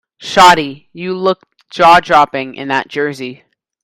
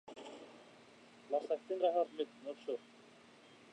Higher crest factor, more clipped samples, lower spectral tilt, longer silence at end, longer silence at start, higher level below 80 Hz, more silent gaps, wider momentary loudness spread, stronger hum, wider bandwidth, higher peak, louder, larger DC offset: second, 12 dB vs 20 dB; first, 0.6% vs under 0.1%; about the same, -3.5 dB/octave vs -4.5 dB/octave; second, 0.5 s vs 0.9 s; first, 0.2 s vs 0.05 s; first, -46 dBFS vs under -90 dBFS; neither; second, 18 LU vs 26 LU; neither; first, 17.5 kHz vs 10 kHz; first, 0 dBFS vs -22 dBFS; first, -11 LUFS vs -39 LUFS; neither